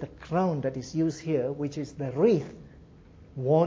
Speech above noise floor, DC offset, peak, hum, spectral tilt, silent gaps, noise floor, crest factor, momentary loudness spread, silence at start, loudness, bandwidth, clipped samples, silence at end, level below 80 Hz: 25 dB; under 0.1%; -10 dBFS; none; -8 dB/octave; none; -52 dBFS; 18 dB; 12 LU; 0 s; -28 LUFS; 7.8 kHz; under 0.1%; 0 s; -56 dBFS